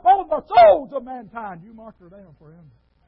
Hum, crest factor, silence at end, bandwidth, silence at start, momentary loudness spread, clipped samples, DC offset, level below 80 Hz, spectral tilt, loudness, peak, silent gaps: none; 16 dB; 1.55 s; 5.4 kHz; 0.05 s; 22 LU; under 0.1%; under 0.1%; -54 dBFS; -9 dB/octave; -15 LUFS; -2 dBFS; none